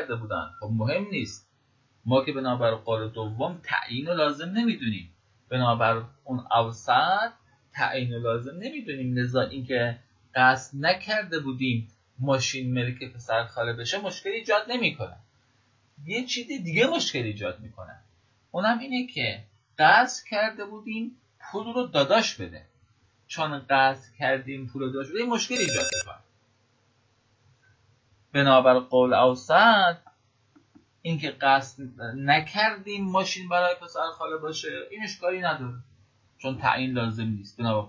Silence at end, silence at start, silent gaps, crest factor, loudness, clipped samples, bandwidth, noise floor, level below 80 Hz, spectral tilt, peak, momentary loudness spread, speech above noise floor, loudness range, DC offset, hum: 0 s; 0 s; none; 24 dB; -26 LUFS; under 0.1%; 8 kHz; -66 dBFS; -62 dBFS; -4.5 dB/octave; -4 dBFS; 15 LU; 41 dB; 7 LU; under 0.1%; none